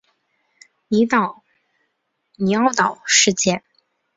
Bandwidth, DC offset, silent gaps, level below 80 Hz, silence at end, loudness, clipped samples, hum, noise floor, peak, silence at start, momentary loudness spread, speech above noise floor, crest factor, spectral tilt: 8 kHz; under 0.1%; none; -62 dBFS; 0.6 s; -18 LUFS; under 0.1%; none; -72 dBFS; 0 dBFS; 0.9 s; 10 LU; 55 dB; 20 dB; -3 dB/octave